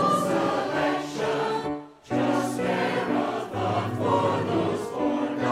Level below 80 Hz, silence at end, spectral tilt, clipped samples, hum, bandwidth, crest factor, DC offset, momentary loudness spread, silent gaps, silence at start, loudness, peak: -60 dBFS; 0 s; -6 dB/octave; under 0.1%; none; 15.5 kHz; 16 dB; under 0.1%; 5 LU; none; 0 s; -26 LUFS; -10 dBFS